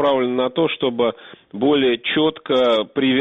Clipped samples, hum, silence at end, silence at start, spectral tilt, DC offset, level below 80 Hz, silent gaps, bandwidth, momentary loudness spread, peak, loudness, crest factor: under 0.1%; none; 0 s; 0 s; -7 dB/octave; under 0.1%; -58 dBFS; none; 7 kHz; 5 LU; -6 dBFS; -19 LUFS; 12 dB